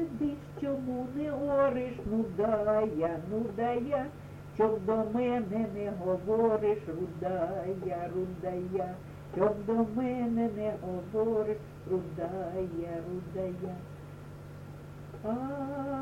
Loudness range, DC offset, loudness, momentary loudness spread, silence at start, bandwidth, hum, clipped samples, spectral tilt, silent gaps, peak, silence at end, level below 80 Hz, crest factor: 7 LU; under 0.1%; -32 LUFS; 13 LU; 0 s; 16 kHz; none; under 0.1%; -8.5 dB/octave; none; -14 dBFS; 0 s; -56 dBFS; 18 dB